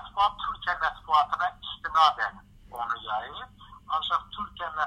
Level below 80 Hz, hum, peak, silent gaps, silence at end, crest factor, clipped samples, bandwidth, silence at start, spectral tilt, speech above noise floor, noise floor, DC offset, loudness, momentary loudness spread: -54 dBFS; none; -6 dBFS; none; 0 s; 22 dB; under 0.1%; 15 kHz; 0 s; -2.5 dB/octave; 21 dB; -46 dBFS; under 0.1%; -28 LUFS; 15 LU